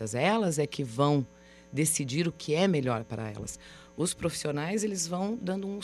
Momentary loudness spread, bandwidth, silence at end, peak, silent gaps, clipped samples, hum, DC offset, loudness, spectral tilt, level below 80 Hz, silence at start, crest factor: 12 LU; 14.5 kHz; 0 s; -12 dBFS; none; under 0.1%; none; under 0.1%; -30 LUFS; -4.5 dB/octave; -60 dBFS; 0 s; 18 dB